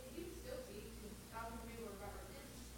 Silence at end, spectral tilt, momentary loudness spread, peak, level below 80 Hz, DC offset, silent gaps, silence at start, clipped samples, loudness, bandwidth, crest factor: 0 s; -4.5 dB/octave; 4 LU; -36 dBFS; -58 dBFS; under 0.1%; none; 0 s; under 0.1%; -52 LUFS; 17 kHz; 16 dB